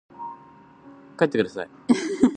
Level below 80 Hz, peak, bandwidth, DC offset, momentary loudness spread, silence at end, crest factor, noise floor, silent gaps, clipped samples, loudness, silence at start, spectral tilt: -62 dBFS; -4 dBFS; 9.4 kHz; under 0.1%; 20 LU; 0 s; 22 dB; -50 dBFS; none; under 0.1%; -24 LUFS; 0.2 s; -5.5 dB/octave